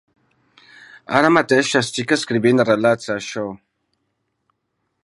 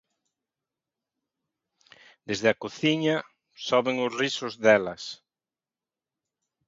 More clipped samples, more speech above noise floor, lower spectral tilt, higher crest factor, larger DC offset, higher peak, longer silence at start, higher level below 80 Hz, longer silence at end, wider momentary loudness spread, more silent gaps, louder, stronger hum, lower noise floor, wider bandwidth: neither; second, 56 dB vs over 65 dB; about the same, -4.5 dB/octave vs -4.5 dB/octave; about the same, 20 dB vs 24 dB; neither; first, 0 dBFS vs -6 dBFS; second, 1.1 s vs 2.3 s; first, -62 dBFS vs -70 dBFS; about the same, 1.45 s vs 1.5 s; second, 11 LU vs 16 LU; neither; first, -17 LUFS vs -25 LUFS; neither; second, -73 dBFS vs under -90 dBFS; first, 11.5 kHz vs 7.8 kHz